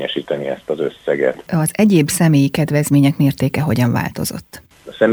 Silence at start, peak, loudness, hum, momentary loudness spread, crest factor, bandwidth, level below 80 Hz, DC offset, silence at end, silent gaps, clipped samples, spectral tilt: 0 s; 0 dBFS; -16 LUFS; none; 9 LU; 16 dB; over 20 kHz; -48 dBFS; under 0.1%; 0 s; none; under 0.1%; -6 dB/octave